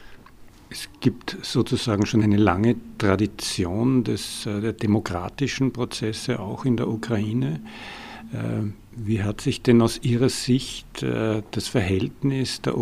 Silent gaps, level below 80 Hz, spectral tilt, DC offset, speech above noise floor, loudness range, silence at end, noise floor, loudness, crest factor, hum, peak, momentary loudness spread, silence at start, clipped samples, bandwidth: none; -48 dBFS; -6 dB/octave; under 0.1%; 23 dB; 4 LU; 0 s; -46 dBFS; -24 LUFS; 22 dB; none; -2 dBFS; 13 LU; 0 s; under 0.1%; 15.5 kHz